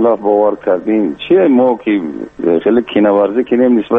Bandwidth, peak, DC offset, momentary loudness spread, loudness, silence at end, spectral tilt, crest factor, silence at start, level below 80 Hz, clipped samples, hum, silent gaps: 3.9 kHz; -2 dBFS; under 0.1%; 6 LU; -12 LUFS; 0 s; -8.5 dB/octave; 10 dB; 0 s; -52 dBFS; under 0.1%; none; none